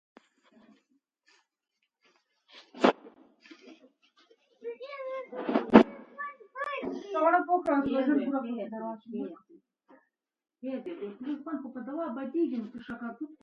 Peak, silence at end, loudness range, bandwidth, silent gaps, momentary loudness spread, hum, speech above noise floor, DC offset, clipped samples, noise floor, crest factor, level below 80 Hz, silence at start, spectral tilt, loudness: 0 dBFS; 0.05 s; 12 LU; 7.6 kHz; none; 16 LU; none; 51 dB; under 0.1%; under 0.1%; -82 dBFS; 32 dB; -66 dBFS; 2.55 s; -7 dB/octave; -30 LUFS